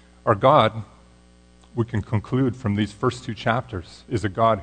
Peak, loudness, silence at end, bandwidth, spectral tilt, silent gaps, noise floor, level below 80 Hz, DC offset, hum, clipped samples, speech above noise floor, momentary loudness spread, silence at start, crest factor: -2 dBFS; -22 LUFS; 0 s; 9.4 kHz; -7 dB/octave; none; -52 dBFS; -50 dBFS; under 0.1%; 60 Hz at -45 dBFS; under 0.1%; 30 dB; 15 LU; 0.25 s; 20 dB